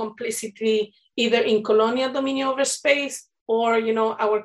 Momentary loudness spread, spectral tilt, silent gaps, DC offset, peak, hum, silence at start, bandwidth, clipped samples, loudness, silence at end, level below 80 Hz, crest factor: 9 LU; -2.5 dB/octave; 3.41-3.46 s; under 0.1%; -6 dBFS; none; 0 s; 12.5 kHz; under 0.1%; -22 LUFS; 0 s; -74 dBFS; 16 dB